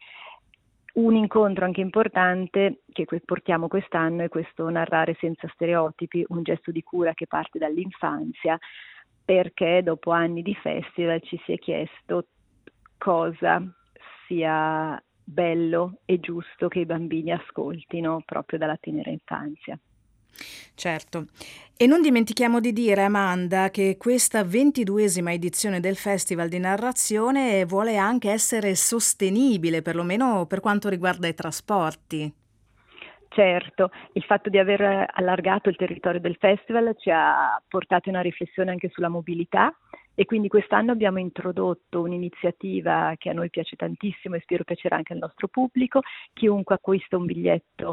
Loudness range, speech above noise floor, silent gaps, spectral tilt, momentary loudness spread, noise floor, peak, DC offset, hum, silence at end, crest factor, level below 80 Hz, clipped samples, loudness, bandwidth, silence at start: 6 LU; 39 dB; none; -4.5 dB/octave; 11 LU; -63 dBFS; -2 dBFS; under 0.1%; none; 0 s; 22 dB; -66 dBFS; under 0.1%; -24 LUFS; 15.5 kHz; 0.1 s